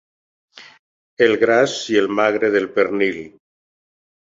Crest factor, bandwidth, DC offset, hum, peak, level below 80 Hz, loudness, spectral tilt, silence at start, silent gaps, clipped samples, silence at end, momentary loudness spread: 18 dB; 7.8 kHz; under 0.1%; none; -2 dBFS; -62 dBFS; -17 LUFS; -4 dB/octave; 0.6 s; 0.79-1.17 s; under 0.1%; 0.95 s; 5 LU